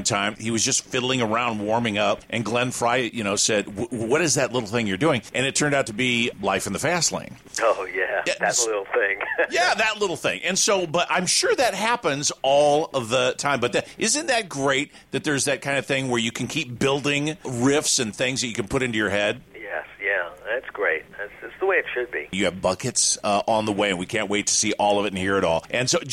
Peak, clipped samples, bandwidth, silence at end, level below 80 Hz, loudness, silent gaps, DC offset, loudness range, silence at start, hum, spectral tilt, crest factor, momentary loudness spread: -8 dBFS; under 0.1%; 15.5 kHz; 0 s; -56 dBFS; -22 LUFS; none; under 0.1%; 3 LU; 0 s; none; -3 dB/octave; 16 dB; 6 LU